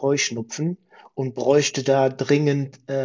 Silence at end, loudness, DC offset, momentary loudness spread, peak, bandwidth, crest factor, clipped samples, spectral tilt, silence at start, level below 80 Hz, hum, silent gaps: 0 s; -22 LUFS; under 0.1%; 11 LU; -6 dBFS; 7.6 kHz; 16 dB; under 0.1%; -5 dB/octave; 0 s; -68 dBFS; none; none